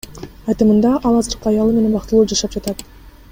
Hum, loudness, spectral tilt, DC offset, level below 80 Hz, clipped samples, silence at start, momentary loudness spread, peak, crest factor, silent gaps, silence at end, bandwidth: none; -16 LUFS; -5.5 dB/octave; under 0.1%; -36 dBFS; under 0.1%; 0.1 s; 14 LU; -2 dBFS; 14 dB; none; 0.25 s; 16.5 kHz